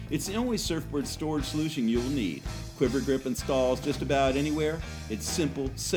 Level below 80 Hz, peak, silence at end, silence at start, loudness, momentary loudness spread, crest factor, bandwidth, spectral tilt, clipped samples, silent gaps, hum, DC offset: -42 dBFS; -12 dBFS; 0 s; 0 s; -29 LUFS; 7 LU; 16 dB; over 20 kHz; -5 dB/octave; under 0.1%; none; none; under 0.1%